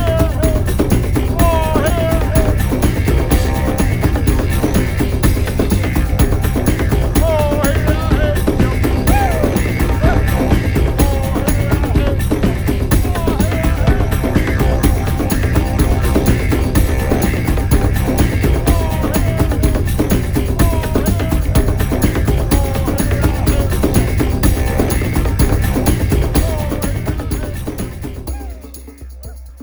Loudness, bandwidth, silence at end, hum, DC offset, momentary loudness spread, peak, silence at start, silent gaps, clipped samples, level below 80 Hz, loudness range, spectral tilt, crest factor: -16 LUFS; over 20 kHz; 0 s; none; under 0.1%; 3 LU; 0 dBFS; 0 s; none; under 0.1%; -18 dBFS; 1 LU; -6.5 dB/octave; 14 dB